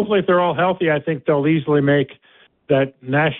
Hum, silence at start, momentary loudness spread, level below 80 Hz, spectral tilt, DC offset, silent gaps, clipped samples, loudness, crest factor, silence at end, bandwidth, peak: none; 0 s; 4 LU; -58 dBFS; -12 dB/octave; under 0.1%; none; under 0.1%; -18 LUFS; 14 dB; 0 s; 4.1 kHz; -4 dBFS